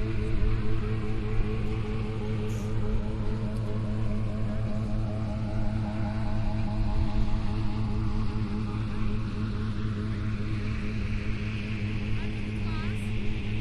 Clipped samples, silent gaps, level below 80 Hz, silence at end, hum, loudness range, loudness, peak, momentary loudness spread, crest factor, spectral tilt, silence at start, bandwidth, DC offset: under 0.1%; none; -32 dBFS; 0 s; none; 1 LU; -32 LUFS; -12 dBFS; 2 LU; 14 dB; -8 dB/octave; 0 s; 9.4 kHz; under 0.1%